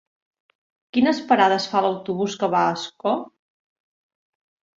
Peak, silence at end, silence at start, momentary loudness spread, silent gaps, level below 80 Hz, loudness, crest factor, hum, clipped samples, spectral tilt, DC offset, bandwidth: -2 dBFS; 1.5 s; 0.95 s; 9 LU; none; -66 dBFS; -21 LUFS; 22 dB; none; under 0.1%; -5 dB/octave; under 0.1%; 7.8 kHz